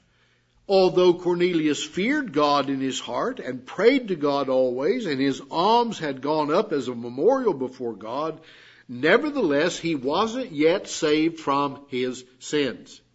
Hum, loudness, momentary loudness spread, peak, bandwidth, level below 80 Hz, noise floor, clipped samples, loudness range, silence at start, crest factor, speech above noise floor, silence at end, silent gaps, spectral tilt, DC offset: none; -23 LUFS; 10 LU; -4 dBFS; 8 kHz; -66 dBFS; -63 dBFS; under 0.1%; 2 LU; 0.7 s; 20 dB; 40 dB; 0.15 s; none; -4.5 dB/octave; under 0.1%